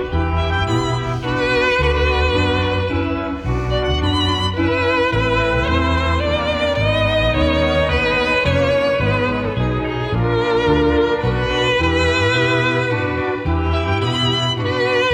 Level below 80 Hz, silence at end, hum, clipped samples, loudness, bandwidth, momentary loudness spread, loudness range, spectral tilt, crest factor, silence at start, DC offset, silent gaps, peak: -28 dBFS; 0 s; none; under 0.1%; -17 LUFS; 10.5 kHz; 5 LU; 1 LU; -6 dB/octave; 12 dB; 0 s; under 0.1%; none; -4 dBFS